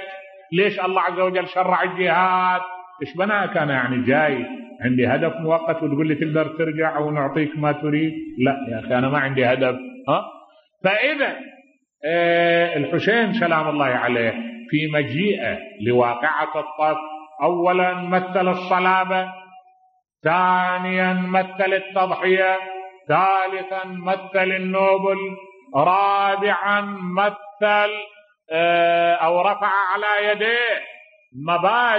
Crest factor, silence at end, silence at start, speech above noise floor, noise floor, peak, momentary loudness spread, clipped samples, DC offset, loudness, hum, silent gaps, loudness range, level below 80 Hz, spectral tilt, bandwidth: 16 dB; 0 s; 0 s; 33 dB; -53 dBFS; -4 dBFS; 9 LU; under 0.1%; under 0.1%; -20 LUFS; none; none; 2 LU; -66 dBFS; -8 dB/octave; 6 kHz